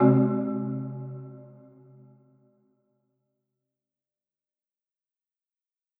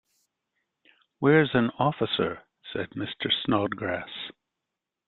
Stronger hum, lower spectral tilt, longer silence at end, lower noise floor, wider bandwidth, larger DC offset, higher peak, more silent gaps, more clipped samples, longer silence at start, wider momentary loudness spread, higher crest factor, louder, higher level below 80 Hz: neither; first, -14 dB/octave vs -8.5 dB/octave; first, 4.55 s vs 0.75 s; first, -90 dBFS vs -86 dBFS; second, 2.8 kHz vs 4.4 kHz; neither; about the same, -8 dBFS vs -6 dBFS; neither; neither; second, 0 s vs 1.2 s; first, 25 LU vs 16 LU; about the same, 24 dB vs 22 dB; about the same, -27 LUFS vs -26 LUFS; second, -76 dBFS vs -62 dBFS